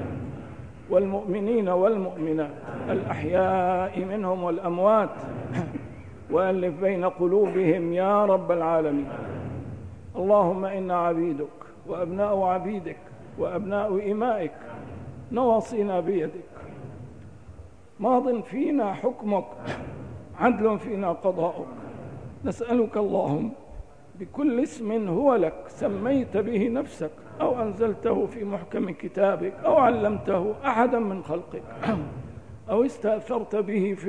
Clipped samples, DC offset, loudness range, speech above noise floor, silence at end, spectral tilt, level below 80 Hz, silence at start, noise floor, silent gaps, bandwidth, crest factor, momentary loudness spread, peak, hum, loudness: under 0.1%; 0.3%; 4 LU; 22 dB; 0 s; -8 dB/octave; -54 dBFS; 0 s; -47 dBFS; none; 10 kHz; 18 dB; 18 LU; -8 dBFS; none; -26 LUFS